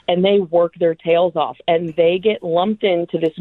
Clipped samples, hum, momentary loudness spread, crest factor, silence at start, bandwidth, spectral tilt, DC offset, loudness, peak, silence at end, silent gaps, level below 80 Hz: under 0.1%; none; 4 LU; 14 dB; 0.1 s; 4.2 kHz; -8.5 dB/octave; under 0.1%; -17 LUFS; -2 dBFS; 0 s; none; -60 dBFS